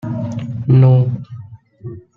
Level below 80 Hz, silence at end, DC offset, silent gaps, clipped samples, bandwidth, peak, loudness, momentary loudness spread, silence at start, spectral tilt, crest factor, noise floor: -48 dBFS; 0.15 s; under 0.1%; none; under 0.1%; 3.3 kHz; -2 dBFS; -14 LUFS; 24 LU; 0.05 s; -10.5 dB/octave; 14 dB; -34 dBFS